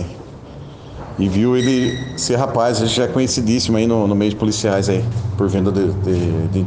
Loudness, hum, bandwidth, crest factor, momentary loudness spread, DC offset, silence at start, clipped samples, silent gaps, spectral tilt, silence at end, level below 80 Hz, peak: -17 LUFS; none; 10 kHz; 14 dB; 18 LU; under 0.1%; 0 s; under 0.1%; none; -5.5 dB/octave; 0 s; -40 dBFS; -4 dBFS